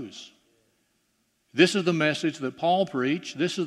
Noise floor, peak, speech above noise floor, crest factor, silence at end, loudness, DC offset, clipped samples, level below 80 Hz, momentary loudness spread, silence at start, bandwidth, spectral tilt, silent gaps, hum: -72 dBFS; -4 dBFS; 47 dB; 22 dB; 0 s; -25 LUFS; under 0.1%; under 0.1%; -76 dBFS; 12 LU; 0 s; 12.5 kHz; -5 dB/octave; none; none